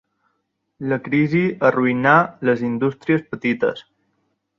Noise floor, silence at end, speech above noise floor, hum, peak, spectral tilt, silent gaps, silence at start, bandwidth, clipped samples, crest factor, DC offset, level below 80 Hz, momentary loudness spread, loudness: -72 dBFS; 0.8 s; 54 dB; none; -2 dBFS; -8.5 dB/octave; none; 0.8 s; 6.8 kHz; under 0.1%; 20 dB; under 0.1%; -60 dBFS; 9 LU; -19 LUFS